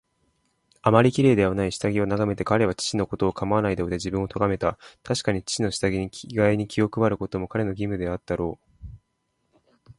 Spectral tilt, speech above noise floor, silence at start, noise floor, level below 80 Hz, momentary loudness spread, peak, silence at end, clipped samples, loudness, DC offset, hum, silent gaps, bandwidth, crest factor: -6 dB/octave; 50 dB; 0.85 s; -74 dBFS; -46 dBFS; 9 LU; -2 dBFS; 0.05 s; under 0.1%; -24 LUFS; under 0.1%; none; none; 11.5 kHz; 22 dB